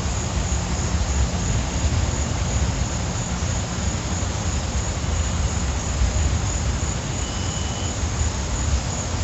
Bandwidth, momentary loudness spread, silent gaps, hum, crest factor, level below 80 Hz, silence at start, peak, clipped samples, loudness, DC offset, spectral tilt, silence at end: 8.2 kHz; 3 LU; none; none; 14 dB; -26 dBFS; 0 s; -8 dBFS; under 0.1%; -24 LUFS; under 0.1%; -4 dB/octave; 0 s